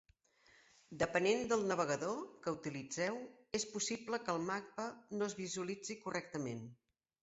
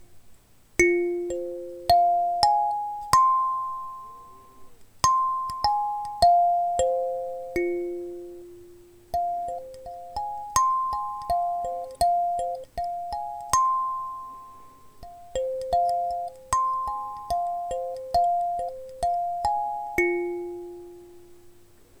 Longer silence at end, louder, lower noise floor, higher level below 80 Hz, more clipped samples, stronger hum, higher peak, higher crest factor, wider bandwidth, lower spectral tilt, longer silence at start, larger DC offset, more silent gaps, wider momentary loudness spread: first, 0.5 s vs 0.35 s; second, -40 LUFS vs -26 LUFS; first, -70 dBFS vs -54 dBFS; second, -74 dBFS vs -50 dBFS; neither; neither; second, -20 dBFS vs -2 dBFS; about the same, 22 dB vs 24 dB; second, 8 kHz vs over 20 kHz; about the same, -3.5 dB/octave vs -3.5 dB/octave; first, 0.9 s vs 0 s; neither; neither; second, 10 LU vs 16 LU